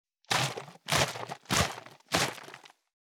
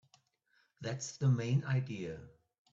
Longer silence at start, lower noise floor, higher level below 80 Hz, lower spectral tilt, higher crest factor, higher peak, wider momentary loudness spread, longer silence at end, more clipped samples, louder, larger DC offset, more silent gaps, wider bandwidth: second, 0.3 s vs 0.8 s; second, -52 dBFS vs -75 dBFS; first, -56 dBFS vs -70 dBFS; second, -2.5 dB/octave vs -6 dB/octave; first, 22 dB vs 16 dB; first, -10 dBFS vs -20 dBFS; first, 17 LU vs 13 LU; about the same, 0.5 s vs 0.45 s; neither; first, -30 LUFS vs -36 LUFS; neither; neither; first, over 20 kHz vs 7.8 kHz